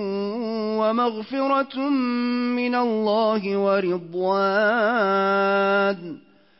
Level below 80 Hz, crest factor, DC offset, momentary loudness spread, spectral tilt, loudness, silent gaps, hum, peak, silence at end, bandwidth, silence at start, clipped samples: -74 dBFS; 12 dB; under 0.1%; 7 LU; -9.5 dB/octave; -22 LUFS; none; none; -10 dBFS; 0.45 s; 5.8 kHz; 0 s; under 0.1%